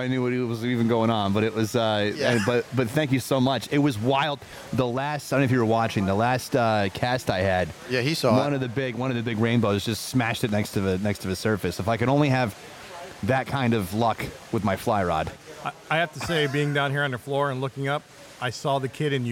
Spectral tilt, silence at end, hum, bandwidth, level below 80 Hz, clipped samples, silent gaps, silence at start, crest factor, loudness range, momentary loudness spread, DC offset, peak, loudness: -6 dB/octave; 0 s; none; 17 kHz; -54 dBFS; under 0.1%; none; 0 s; 18 dB; 3 LU; 7 LU; under 0.1%; -8 dBFS; -25 LUFS